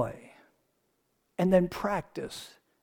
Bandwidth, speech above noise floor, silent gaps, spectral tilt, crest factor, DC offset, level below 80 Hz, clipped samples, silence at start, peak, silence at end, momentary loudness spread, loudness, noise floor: 18 kHz; 47 dB; none; -7 dB/octave; 20 dB; under 0.1%; -56 dBFS; under 0.1%; 0 s; -12 dBFS; 0.35 s; 21 LU; -30 LUFS; -75 dBFS